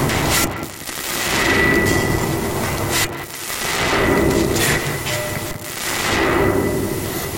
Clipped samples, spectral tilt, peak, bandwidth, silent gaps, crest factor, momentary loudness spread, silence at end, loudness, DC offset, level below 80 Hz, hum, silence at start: under 0.1%; -3.5 dB/octave; -4 dBFS; 17 kHz; none; 14 dB; 9 LU; 0 s; -18 LUFS; under 0.1%; -34 dBFS; none; 0 s